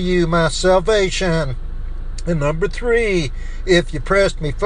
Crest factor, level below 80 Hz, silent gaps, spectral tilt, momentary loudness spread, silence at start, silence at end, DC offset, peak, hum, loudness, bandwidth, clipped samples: 16 dB; -24 dBFS; none; -5 dB/octave; 14 LU; 0 s; 0 s; under 0.1%; 0 dBFS; none; -17 LUFS; 10 kHz; under 0.1%